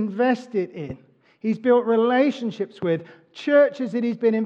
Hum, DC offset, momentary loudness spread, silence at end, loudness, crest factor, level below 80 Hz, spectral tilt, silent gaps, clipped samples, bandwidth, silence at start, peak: none; under 0.1%; 13 LU; 0 s; -22 LUFS; 16 dB; -66 dBFS; -7 dB/octave; none; under 0.1%; 7.8 kHz; 0 s; -6 dBFS